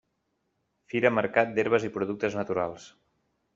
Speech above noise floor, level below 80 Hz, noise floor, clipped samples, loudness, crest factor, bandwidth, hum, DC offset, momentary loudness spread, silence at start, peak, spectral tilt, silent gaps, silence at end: 50 dB; -68 dBFS; -77 dBFS; under 0.1%; -27 LUFS; 22 dB; 7.8 kHz; none; under 0.1%; 9 LU; 0.95 s; -6 dBFS; -4.5 dB/octave; none; 0.7 s